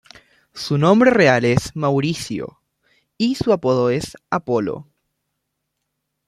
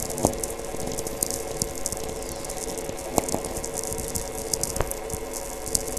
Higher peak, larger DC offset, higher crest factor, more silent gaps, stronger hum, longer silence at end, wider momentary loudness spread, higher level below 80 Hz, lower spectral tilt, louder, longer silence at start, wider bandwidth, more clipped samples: about the same, -2 dBFS vs 0 dBFS; neither; second, 18 dB vs 30 dB; neither; neither; first, 1.45 s vs 0 s; first, 15 LU vs 6 LU; second, -50 dBFS vs -40 dBFS; first, -6 dB/octave vs -3 dB/octave; first, -18 LUFS vs -29 LUFS; first, 0.55 s vs 0 s; second, 13.5 kHz vs 16 kHz; neither